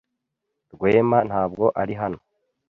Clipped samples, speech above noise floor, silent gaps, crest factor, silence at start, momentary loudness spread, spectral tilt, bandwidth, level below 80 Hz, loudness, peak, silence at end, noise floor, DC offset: under 0.1%; 59 dB; none; 18 dB; 0.75 s; 11 LU; -9.5 dB/octave; 5.6 kHz; -54 dBFS; -21 LUFS; -4 dBFS; 0.55 s; -80 dBFS; under 0.1%